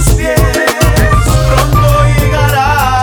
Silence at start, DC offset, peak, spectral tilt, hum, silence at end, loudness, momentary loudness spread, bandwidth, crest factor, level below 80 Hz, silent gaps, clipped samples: 0 s; under 0.1%; 0 dBFS; -5 dB/octave; none; 0 s; -9 LUFS; 2 LU; over 20 kHz; 8 dB; -14 dBFS; none; under 0.1%